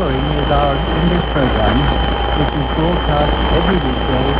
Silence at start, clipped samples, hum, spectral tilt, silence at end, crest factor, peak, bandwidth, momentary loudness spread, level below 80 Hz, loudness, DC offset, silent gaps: 0 s; under 0.1%; none; -10.5 dB/octave; 0 s; 14 dB; 0 dBFS; 4 kHz; 2 LU; -20 dBFS; -16 LUFS; under 0.1%; none